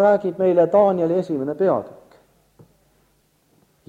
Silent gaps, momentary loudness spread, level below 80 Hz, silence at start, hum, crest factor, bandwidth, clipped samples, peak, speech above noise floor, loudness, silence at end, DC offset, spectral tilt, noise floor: none; 10 LU; -64 dBFS; 0 s; none; 16 dB; 7.6 kHz; under 0.1%; -4 dBFS; 44 dB; -19 LUFS; 2 s; under 0.1%; -9 dB/octave; -62 dBFS